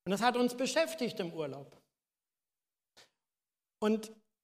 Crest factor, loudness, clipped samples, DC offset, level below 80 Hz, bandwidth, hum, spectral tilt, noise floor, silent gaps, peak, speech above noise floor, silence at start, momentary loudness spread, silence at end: 24 dB; -34 LUFS; under 0.1%; under 0.1%; -82 dBFS; 15.5 kHz; none; -4 dB/octave; under -90 dBFS; none; -12 dBFS; over 57 dB; 0.05 s; 12 LU; 0.3 s